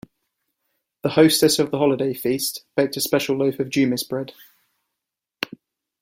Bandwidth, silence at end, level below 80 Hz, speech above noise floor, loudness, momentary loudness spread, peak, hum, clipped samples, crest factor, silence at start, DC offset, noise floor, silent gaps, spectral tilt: 16.5 kHz; 0.55 s; -62 dBFS; 64 dB; -21 LUFS; 15 LU; -2 dBFS; none; under 0.1%; 20 dB; 1.05 s; under 0.1%; -84 dBFS; none; -4 dB/octave